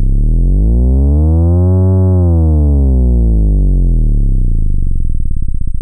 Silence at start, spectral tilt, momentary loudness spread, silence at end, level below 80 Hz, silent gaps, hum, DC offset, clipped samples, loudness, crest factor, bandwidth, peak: 0 s; -14 dB/octave; 9 LU; 0 s; -10 dBFS; none; none; under 0.1%; under 0.1%; -12 LUFS; 6 dB; 1.5 kHz; -2 dBFS